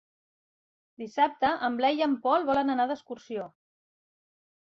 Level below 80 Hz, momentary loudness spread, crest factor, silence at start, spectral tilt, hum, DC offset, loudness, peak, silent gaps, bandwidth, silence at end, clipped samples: -70 dBFS; 13 LU; 18 dB; 1 s; -5 dB/octave; none; under 0.1%; -28 LUFS; -10 dBFS; none; 7.2 kHz; 1.2 s; under 0.1%